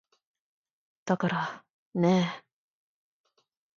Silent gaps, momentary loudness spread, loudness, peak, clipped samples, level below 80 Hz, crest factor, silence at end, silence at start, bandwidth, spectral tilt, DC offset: 1.70-1.92 s; 20 LU; -29 LUFS; -10 dBFS; under 0.1%; -74 dBFS; 22 dB; 1.4 s; 1.05 s; 7.4 kHz; -6.5 dB/octave; under 0.1%